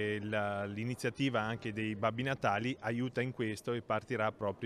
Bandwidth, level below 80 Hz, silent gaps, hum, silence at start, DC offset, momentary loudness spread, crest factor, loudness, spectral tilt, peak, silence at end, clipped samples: 14.5 kHz; -68 dBFS; none; none; 0 s; under 0.1%; 4 LU; 18 dB; -36 LUFS; -6 dB/octave; -16 dBFS; 0 s; under 0.1%